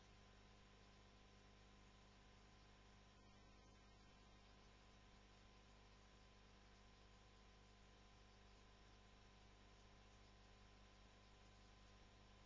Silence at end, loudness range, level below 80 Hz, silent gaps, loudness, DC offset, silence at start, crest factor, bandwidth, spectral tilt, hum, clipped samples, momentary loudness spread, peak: 0 s; 0 LU; -72 dBFS; none; -69 LUFS; under 0.1%; 0 s; 12 dB; 7.2 kHz; -3.5 dB/octave; 50 Hz at -70 dBFS; under 0.1%; 1 LU; -56 dBFS